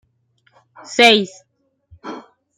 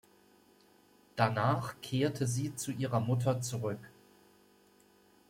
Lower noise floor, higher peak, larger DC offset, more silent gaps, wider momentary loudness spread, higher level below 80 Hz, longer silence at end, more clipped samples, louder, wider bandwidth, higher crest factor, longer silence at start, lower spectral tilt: about the same, -62 dBFS vs -65 dBFS; first, 0 dBFS vs -14 dBFS; neither; neither; first, 25 LU vs 8 LU; first, -64 dBFS vs -70 dBFS; second, 0.4 s vs 1.4 s; neither; first, -13 LUFS vs -34 LUFS; about the same, 16 kHz vs 16.5 kHz; about the same, 20 dB vs 22 dB; second, 0.9 s vs 1.15 s; second, -2.5 dB/octave vs -5.5 dB/octave